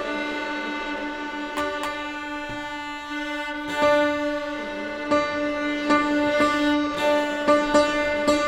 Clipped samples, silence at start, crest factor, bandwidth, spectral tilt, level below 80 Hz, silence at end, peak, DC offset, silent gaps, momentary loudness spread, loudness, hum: under 0.1%; 0 s; 18 dB; 15 kHz; -4 dB/octave; -50 dBFS; 0 s; -6 dBFS; under 0.1%; none; 10 LU; -24 LUFS; none